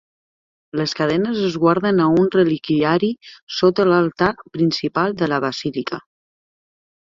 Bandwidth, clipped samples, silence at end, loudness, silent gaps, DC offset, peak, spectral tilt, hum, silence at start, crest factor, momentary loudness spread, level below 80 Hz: 7.6 kHz; under 0.1%; 1.15 s; -19 LUFS; 3.42-3.47 s; under 0.1%; -2 dBFS; -6.5 dB/octave; none; 0.75 s; 18 dB; 10 LU; -56 dBFS